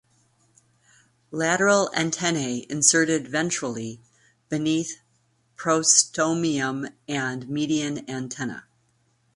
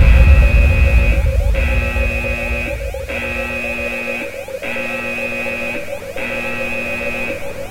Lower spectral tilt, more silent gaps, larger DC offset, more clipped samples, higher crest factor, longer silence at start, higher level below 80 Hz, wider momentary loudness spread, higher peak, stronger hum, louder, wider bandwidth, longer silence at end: second, -3 dB/octave vs -6 dB/octave; neither; neither; neither; first, 22 dB vs 16 dB; first, 1.3 s vs 0 s; second, -66 dBFS vs -18 dBFS; first, 16 LU vs 11 LU; about the same, -2 dBFS vs 0 dBFS; neither; second, -23 LUFS vs -18 LUFS; second, 11.5 kHz vs 16 kHz; first, 0.75 s vs 0 s